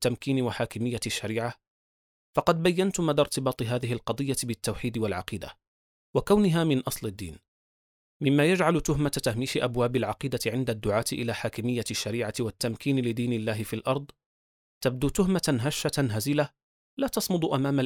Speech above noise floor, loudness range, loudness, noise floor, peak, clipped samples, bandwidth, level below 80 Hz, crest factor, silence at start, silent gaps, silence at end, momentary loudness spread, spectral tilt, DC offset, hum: over 63 dB; 3 LU; -28 LUFS; under -90 dBFS; -8 dBFS; under 0.1%; 19.5 kHz; -50 dBFS; 20 dB; 0 s; 1.67-2.33 s, 5.67-6.14 s, 7.48-8.20 s, 14.26-14.81 s, 16.63-16.97 s; 0 s; 8 LU; -5.5 dB/octave; under 0.1%; none